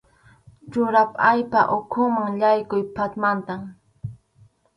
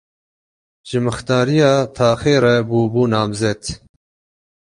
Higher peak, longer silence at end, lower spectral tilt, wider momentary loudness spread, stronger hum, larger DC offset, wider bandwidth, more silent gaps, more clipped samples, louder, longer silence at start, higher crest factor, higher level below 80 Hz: about the same, -4 dBFS vs -2 dBFS; second, 0.6 s vs 0.9 s; first, -8 dB/octave vs -6 dB/octave; first, 20 LU vs 10 LU; neither; neither; about the same, 10.5 kHz vs 11.5 kHz; neither; neither; second, -21 LUFS vs -16 LUFS; second, 0.65 s vs 0.85 s; about the same, 18 dB vs 16 dB; second, -58 dBFS vs -46 dBFS